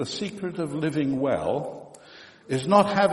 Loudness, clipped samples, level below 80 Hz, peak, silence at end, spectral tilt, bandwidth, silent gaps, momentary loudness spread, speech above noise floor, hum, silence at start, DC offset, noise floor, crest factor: -25 LUFS; under 0.1%; -62 dBFS; -4 dBFS; 0 s; -6 dB/octave; 11.5 kHz; none; 20 LU; 25 dB; none; 0 s; under 0.1%; -49 dBFS; 22 dB